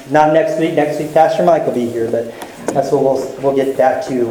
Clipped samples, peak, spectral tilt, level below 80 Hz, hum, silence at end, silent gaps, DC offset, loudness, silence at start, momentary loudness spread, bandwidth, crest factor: under 0.1%; 0 dBFS; -6 dB/octave; -52 dBFS; none; 0 s; none; under 0.1%; -15 LUFS; 0 s; 8 LU; 18.5 kHz; 14 dB